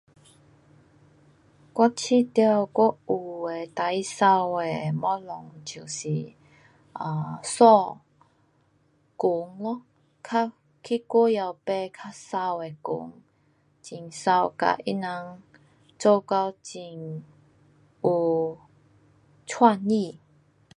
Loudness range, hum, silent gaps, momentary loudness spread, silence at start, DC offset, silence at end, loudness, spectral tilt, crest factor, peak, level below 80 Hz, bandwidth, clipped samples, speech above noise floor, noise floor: 5 LU; none; none; 18 LU; 1.75 s; under 0.1%; 0.65 s; -25 LUFS; -5.5 dB/octave; 24 dB; -2 dBFS; -72 dBFS; 11.5 kHz; under 0.1%; 41 dB; -65 dBFS